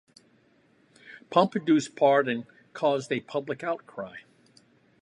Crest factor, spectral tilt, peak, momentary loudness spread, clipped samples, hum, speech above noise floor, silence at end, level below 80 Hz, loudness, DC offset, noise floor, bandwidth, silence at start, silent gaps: 22 dB; -5.5 dB/octave; -6 dBFS; 17 LU; under 0.1%; none; 37 dB; 0.8 s; -78 dBFS; -26 LUFS; under 0.1%; -63 dBFS; 11 kHz; 1.1 s; none